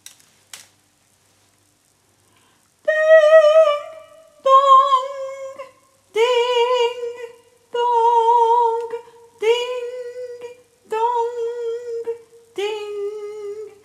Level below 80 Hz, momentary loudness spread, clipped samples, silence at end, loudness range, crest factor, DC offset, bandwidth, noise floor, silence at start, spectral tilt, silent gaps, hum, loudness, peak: -80 dBFS; 22 LU; under 0.1%; 0.15 s; 11 LU; 18 dB; under 0.1%; 13 kHz; -60 dBFS; 0.55 s; -1 dB/octave; none; none; -17 LUFS; 0 dBFS